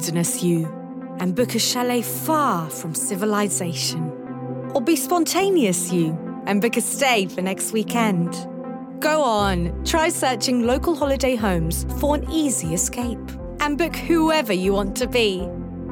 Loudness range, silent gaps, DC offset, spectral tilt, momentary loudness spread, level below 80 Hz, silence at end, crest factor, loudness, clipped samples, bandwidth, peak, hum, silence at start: 2 LU; none; under 0.1%; -4 dB/octave; 10 LU; -38 dBFS; 0 s; 16 dB; -21 LUFS; under 0.1%; 18 kHz; -6 dBFS; none; 0 s